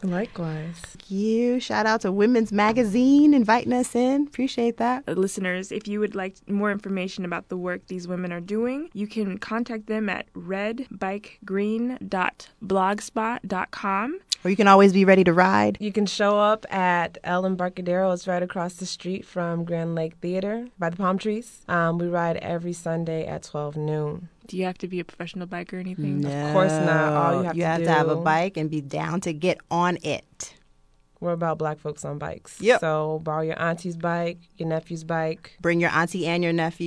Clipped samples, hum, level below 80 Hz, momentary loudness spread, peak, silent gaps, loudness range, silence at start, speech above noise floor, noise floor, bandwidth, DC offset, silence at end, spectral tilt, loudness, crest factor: under 0.1%; none; -58 dBFS; 12 LU; -2 dBFS; none; 9 LU; 0 s; 35 dB; -59 dBFS; 11 kHz; under 0.1%; 0 s; -6 dB/octave; -24 LUFS; 22 dB